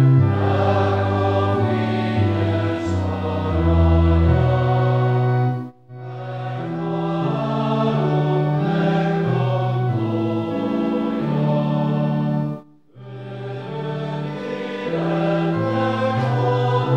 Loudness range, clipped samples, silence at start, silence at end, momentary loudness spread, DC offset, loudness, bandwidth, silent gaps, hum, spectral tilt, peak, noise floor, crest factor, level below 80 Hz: 5 LU; under 0.1%; 0 s; 0 s; 11 LU; 0.2%; -20 LUFS; 7.6 kHz; none; none; -9 dB/octave; -6 dBFS; -42 dBFS; 14 dB; -34 dBFS